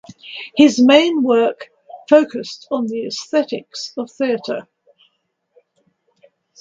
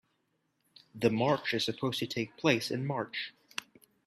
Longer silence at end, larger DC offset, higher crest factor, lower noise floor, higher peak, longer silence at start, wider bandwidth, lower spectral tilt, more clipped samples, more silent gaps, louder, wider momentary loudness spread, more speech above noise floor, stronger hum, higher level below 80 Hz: first, 2 s vs 0.45 s; neither; about the same, 18 dB vs 22 dB; second, -68 dBFS vs -78 dBFS; first, 0 dBFS vs -12 dBFS; second, 0.25 s vs 0.95 s; second, 7.8 kHz vs 14.5 kHz; about the same, -4 dB/octave vs -5 dB/octave; neither; neither; first, -17 LUFS vs -32 LUFS; first, 17 LU vs 11 LU; first, 52 dB vs 46 dB; neither; first, -66 dBFS vs -72 dBFS